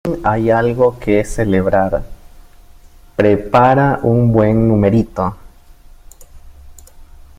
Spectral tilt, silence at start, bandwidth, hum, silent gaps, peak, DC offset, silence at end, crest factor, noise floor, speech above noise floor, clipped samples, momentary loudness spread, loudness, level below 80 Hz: -8 dB/octave; 0.05 s; 15 kHz; none; none; 0 dBFS; under 0.1%; 0.2 s; 14 dB; -41 dBFS; 28 dB; under 0.1%; 8 LU; -14 LUFS; -34 dBFS